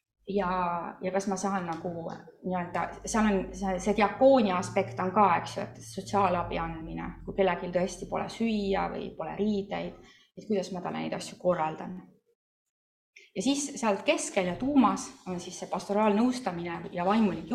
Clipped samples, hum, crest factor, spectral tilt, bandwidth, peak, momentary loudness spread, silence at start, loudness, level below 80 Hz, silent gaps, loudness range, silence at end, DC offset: under 0.1%; none; 20 dB; -5 dB/octave; 13 kHz; -10 dBFS; 13 LU; 0.25 s; -29 LUFS; -54 dBFS; 12.35-13.13 s; 7 LU; 0 s; under 0.1%